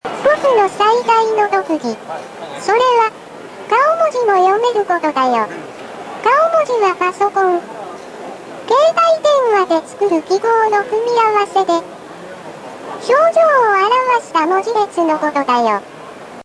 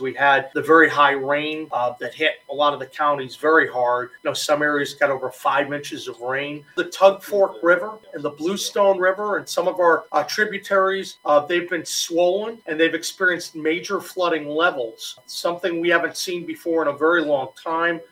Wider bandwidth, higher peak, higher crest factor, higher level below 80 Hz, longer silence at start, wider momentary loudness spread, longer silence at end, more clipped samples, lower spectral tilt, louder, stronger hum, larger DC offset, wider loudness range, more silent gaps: second, 11 kHz vs 16.5 kHz; about the same, -4 dBFS vs -2 dBFS; second, 12 dB vs 20 dB; first, -62 dBFS vs -72 dBFS; about the same, 0.05 s vs 0 s; first, 19 LU vs 9 LU; about the same, 0 s vs 0.05 s; neither; about the same, -3.5 dB/octave vs -3 dB/octave; first, -14 LUFS vs -21 LUFS; neither; neither; about the same, 2 LU vs 3 LU; neither